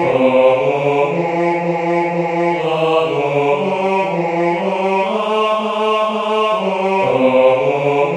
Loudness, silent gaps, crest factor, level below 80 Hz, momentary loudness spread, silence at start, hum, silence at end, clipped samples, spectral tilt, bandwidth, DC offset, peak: -15 LUFS; none; 14 dB; -58 dBFS; 5 LU; 0 s; none; 0 s; under 0.1%; -6.5 dB/octave; 10 kHz; under 0.1%; 0 dBFS